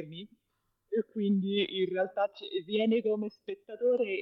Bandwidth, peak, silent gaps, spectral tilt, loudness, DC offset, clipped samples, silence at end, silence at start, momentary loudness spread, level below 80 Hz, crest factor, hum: 5.8 kHz; -18 dBFS; none; -8.5 dB/octave; -31 LUFS; under 0.1%; under 0.1%; 0 s; 0 s; 12 LU; -82 dBFS; 14 dB; none